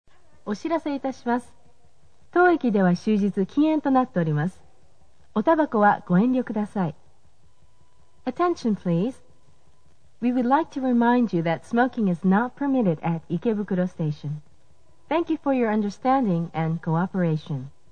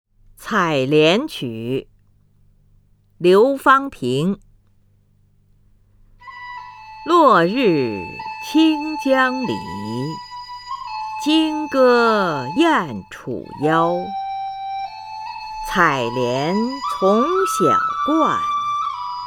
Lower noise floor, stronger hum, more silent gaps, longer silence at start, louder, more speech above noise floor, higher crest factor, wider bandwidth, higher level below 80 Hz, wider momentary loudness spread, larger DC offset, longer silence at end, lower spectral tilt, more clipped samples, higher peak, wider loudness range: first, -62 dBFS vs -56 dBFS; neither; neither; about the same, 0.45 s vs 0.4 s; second, -24 LUFS vs -18 LUFS; about the same, 39 dB vs 39 dB; about the same, 18 dB vs 18 dB; second, 9.4 kHz vs 17.5 kHz; second, -60 dBFS vs -52 dBFS; second, 9 LU vs 17 LU; first, 0.5% vs under 0.1%; first, 0.25 s vs 0 s; first, -8.5 dB/octave vs -5.5 dB/octave; neither; second, -6 dBFS vs 0 dBFS; about the same, 4 LU vs 4 LU